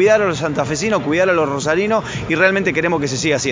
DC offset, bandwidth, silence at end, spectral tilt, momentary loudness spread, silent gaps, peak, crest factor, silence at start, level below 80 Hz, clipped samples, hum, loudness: under 0.1%; 7.6 kHz; 0 s; -4.5 dB/octave; 5 LU; none; 0 dBFS; 16 dB; 0 s; -44 dBFS; under 0.1%; none; -17 LUFS